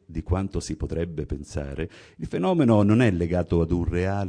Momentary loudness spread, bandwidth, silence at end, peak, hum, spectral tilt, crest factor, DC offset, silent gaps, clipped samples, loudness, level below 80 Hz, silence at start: 14 LU; 10 kHz; 0 s; -6 dBFS; none; -7.5 dB/octave; 16 dB; under 0.1%; none; under 0.1%; -24 LUFS; -38 dBFS; 0.1 s